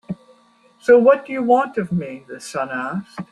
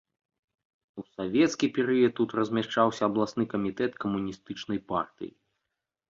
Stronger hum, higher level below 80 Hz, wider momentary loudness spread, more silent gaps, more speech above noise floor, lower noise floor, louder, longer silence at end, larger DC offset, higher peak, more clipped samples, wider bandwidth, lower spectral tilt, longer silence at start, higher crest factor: neither; about the same, -62 dBFS vs -64 dBFS; first, 20 LU vs 16 LU; neither; second, 36 dB vs 57 dB; second, -55 dBFS vs -85 dBFS; first, -18 LUFS vs -28 LUFS; second, 0.1 s vs 0.85 s; neither; first, -2 dBFS vs -10 dBFS; neither; first, 11.5 kHz vs 7.6 kHz; about the same, -6.5 dB/octave vs -5.5 dB/octave; second, 0.1 s vs 0.95 s; about the same, 18 dB vs 20 dB